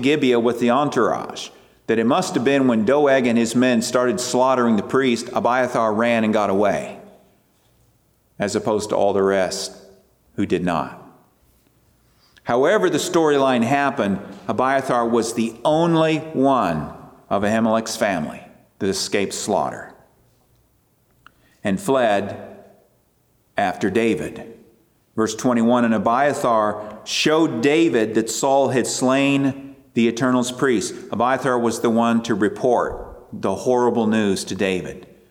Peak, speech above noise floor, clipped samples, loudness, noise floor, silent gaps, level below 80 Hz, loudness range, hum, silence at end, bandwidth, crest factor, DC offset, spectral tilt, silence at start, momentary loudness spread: -4 dBFS; 43 dB; under 0.1%; -19 LUFS; -62 dBFS; none; -56 dBFS; 7 LU; none; 0.25 s; 17 kHz; 16 dB; under 0.1%; -5 dB/octave; 0 s; 10 LU